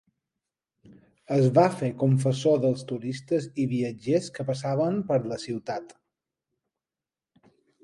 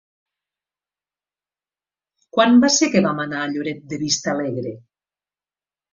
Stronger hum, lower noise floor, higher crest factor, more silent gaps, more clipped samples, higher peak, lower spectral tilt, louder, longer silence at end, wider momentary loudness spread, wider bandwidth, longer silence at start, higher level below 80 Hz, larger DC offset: neither; about the same, under -90 dBFS vs under -90 dBFS; about the same, 20 dB vs 20 dB; neither; neither; second, -8 dBFS vs -2 dBFS; first, -7.5 dB/octave vs -3.5 dB/octave; second, -26 LUFS vs -19 LUFS; first, 1.9 s vs 1.15 s; second, 11 LU vs 14 LU; first, 11.5 kHz vs 7.6 kHz; second, 1.3 s vs 2.35 s; about the same, -68 dBFS vs -64 dBFS; neither